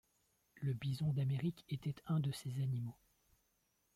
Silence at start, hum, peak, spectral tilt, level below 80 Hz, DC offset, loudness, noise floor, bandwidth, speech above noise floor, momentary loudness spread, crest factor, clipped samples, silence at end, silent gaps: 0.55 s; none; -28 dBFS; -7.5 dB/octave; -70 dBFS; under 0.1%; -41 LUFS; -80 dBFS; 15 kHz; 41 dB; 7 LU; 12 dB; under 0.1%; 1 s; none